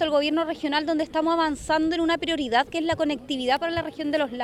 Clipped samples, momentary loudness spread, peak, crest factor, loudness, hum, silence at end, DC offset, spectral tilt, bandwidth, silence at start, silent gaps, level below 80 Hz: under 0.1%; 4 LU; -10 dBFS; 14 dB; -24 LUFS; none; 0 s; under 0.1%; -4 dB/octave; 12 kHz; 0 s; none; -52 dBFS